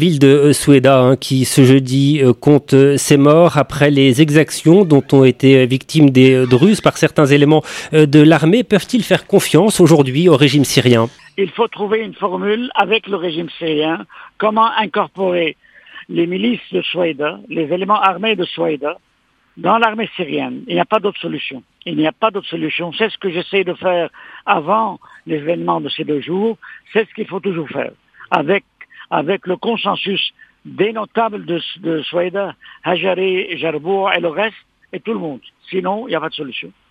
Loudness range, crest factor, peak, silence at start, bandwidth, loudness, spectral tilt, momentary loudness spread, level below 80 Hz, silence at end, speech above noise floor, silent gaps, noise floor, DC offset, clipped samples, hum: 9 LU; 14 dB; 0 dBFS; 0 s; 15.5 kHz; -14 LUFS; -5.5 dB/octave; 13 LU; -54 dBFS; 0.2 s; 37 dB; none; -51 dBFS; under 0.1%; under 0.1%; none